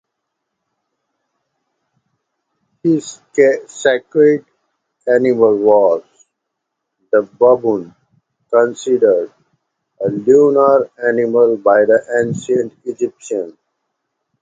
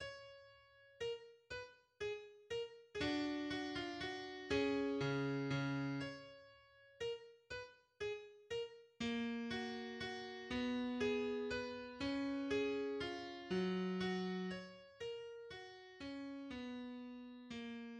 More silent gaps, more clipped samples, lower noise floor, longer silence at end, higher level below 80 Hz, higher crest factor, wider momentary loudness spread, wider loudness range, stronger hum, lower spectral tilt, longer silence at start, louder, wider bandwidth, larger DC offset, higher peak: neither; neither; first, -76 dBFS vs -66 dBFS; first, 0.9 s vs 0 s; first, -62 dBFS vs -70 dBFS; about the same, 16 dB vs 18 dB; about the same, 12 LU vs 13 LU; about the same, 5 LU vs 6 LU; neither; about the same, -6 dB/octave vs -5.5 dB/octave; first, 2.85 s vs 0 s; first, -14 LUFS vs -44 LUFS; second, 9 kHz vs 10 kHz; neither; first, 0 dBFS vs -26 dBFS